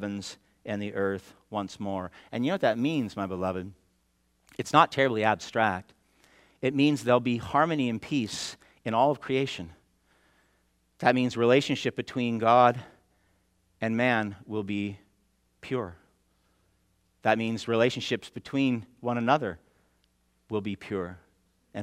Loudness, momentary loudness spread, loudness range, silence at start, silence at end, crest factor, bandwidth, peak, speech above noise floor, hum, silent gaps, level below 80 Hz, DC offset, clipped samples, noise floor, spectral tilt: -28 LUFS; 15 LU; 6 LU; 0 s; 0 s; 24 dB; 14.5 kHz; -4 dBFS; 44 dB; none; none; -68 dBFS; under 0.1%; under 0.1%; -71 dBFS; -5.5 dB/octave